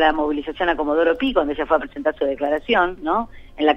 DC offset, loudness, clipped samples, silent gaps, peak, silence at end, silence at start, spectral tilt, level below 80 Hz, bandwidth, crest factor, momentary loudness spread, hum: under 0.1%; -21 LUFS; under 0.1%; none; -2 dBFS; 0 s; 0 s; -6 dB/octave; -42 dBFS; 6.6 kHz; 18 dB; 5 LU; none